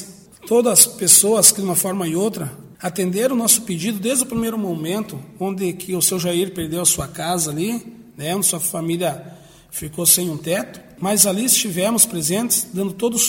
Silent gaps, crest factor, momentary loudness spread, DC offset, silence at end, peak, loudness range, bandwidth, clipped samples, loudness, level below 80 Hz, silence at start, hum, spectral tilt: none; 20 dB; 15 LU; under 0.1%; 0 s; 0 dBFS; 6 LU; 17 kHz; under 0.1%; -17 LUFS; -54 dBFS; 0 s; none; -3 dB/octave